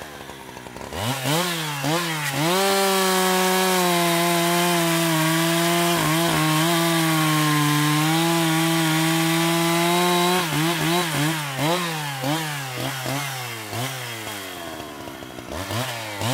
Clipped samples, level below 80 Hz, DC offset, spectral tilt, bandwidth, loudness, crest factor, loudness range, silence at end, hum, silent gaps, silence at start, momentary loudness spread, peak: under 0.1%; -58 dBFS; under 0.1%; -4 dB/octave; 16 kHz; -21 LUFS; 14 dB; 8 LU; 0 s; none; none; 0 s; 13 LU; -6 dBFS